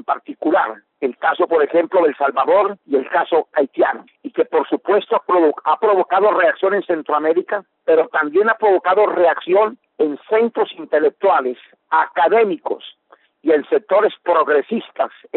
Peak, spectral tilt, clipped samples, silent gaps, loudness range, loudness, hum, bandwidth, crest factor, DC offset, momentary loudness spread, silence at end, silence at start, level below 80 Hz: -4 dBFS; -2 dB/octave; under 0.1%; none; 2 LU; -17 LUFS; none; 4.2 kHz; 12 dB; under 0.1%; 9 LU; 0 s; 0.1 s; -68 dBFS